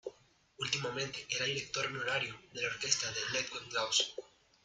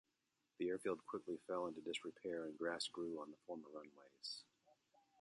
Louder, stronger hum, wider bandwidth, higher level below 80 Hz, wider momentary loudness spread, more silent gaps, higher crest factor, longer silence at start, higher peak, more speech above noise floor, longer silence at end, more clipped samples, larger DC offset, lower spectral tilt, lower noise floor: first, -35 LUFS vs -47 LUFS; neither; about the same, 11 kHz vs 11.5 kHz; first, -72 dBFS vs -86 dBFS; about the same, 8 LU vs 10 LU; neither; first, 24 dB vs 18 dB; second, 0.05 s vs 0.6 s; first, -14 dBFS vs -30 dBFS; second, 28 dB vs 40 dB; about the same, 0.4 s vs 0.5 s; neither; neither; second, -1 dB/octave vs -3.5 dB/octave; second, -65 dBFS vs -88 dBFS